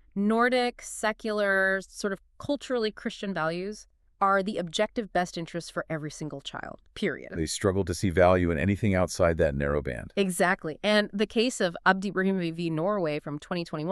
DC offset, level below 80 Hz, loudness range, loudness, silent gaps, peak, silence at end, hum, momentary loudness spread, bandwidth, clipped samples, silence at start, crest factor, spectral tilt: under 0.1%; -48 dBFS; 5 LU; -28 LUFS; none; -6 dBFS; 0 s; none; 11 LU; 13.5 kHz; under 0.1%; 0.15 s; 22 dB; -5 dB/octave